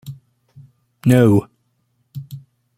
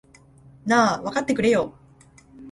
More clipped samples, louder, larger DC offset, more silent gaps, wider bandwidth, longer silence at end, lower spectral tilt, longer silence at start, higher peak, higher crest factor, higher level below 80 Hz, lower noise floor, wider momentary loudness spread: neither; first, -15 LUFS vs -22 LUFS; neither; neither; first, 16 kHz vs 11.5 kHz; first, 0.4 s vs 0 s; first, -8 dB/octave vs -4.5 dB/octave; second, 0.05 s vs 0.65 s; first, 0 dBFS vs -6 dBFS; about the same, 20 dB vs 18 dB; about the same, -54 dBFS vs -58 dBFS; first, -66 dBFS vs -52 dBFS; first, 25 LU vs 12 LU